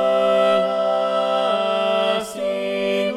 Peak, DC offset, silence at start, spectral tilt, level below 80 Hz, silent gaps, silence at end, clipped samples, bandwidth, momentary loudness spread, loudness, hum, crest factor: -6 dBFS; under 0.1%; 0 s; -4.5 dB/octave; -68 dBFS; none; 0 s; under 0.1%; 14 kHz; 6 LU; -19 LUFS; none; 14 dB